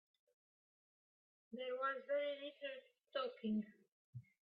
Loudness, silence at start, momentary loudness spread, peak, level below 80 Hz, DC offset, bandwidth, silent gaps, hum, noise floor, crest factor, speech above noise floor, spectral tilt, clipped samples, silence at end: -44 LUFS; 1.5 s; 16 LU; -30 dBFS; under -90 dBFS; under 0.1%; 5.2 kHz; 3.92-4.13 s; none; under -90 dBFS; 18 dB; over 46 dB; -3.5 dB/octave; under 0.1%; 0.25 s